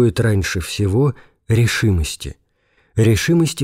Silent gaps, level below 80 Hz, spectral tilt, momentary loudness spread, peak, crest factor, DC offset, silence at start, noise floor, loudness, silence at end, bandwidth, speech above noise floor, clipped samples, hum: none; -34 dBFS; -5.5 dB/octave; 11 LU; -4 dBFS; 12 dB; under 0.1%; 0 s; -61 dBFS; -18 LUFS; 0 s; 16 kHz; 44 dB; under 0.1%; none